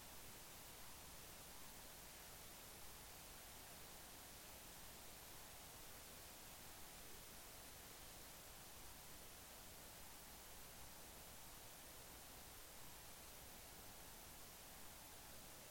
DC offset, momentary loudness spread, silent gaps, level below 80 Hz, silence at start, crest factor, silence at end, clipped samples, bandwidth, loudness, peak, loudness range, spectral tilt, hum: under 0.1%; 1 LU; none; -70 dBFS; 0 s; 14 dB; 0 s; under 0.1%; 17 kHz; -57 LUFS; -44 dBFS; 1 LU; -2 dB/octave; none